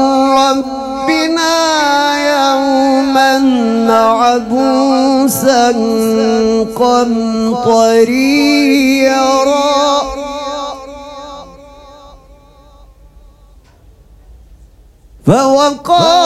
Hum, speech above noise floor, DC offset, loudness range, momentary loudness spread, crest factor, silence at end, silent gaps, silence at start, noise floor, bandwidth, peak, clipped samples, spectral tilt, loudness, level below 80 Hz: none; 33 dB; under 0.1%; 9 LU; 11 LU; 12 dB; 0 s; none; 0 s; -43 dBFS; 15 kHz; 0 dBFS; under 0.1%; -4 dB/octave; -11 LUFS; -42 dBFS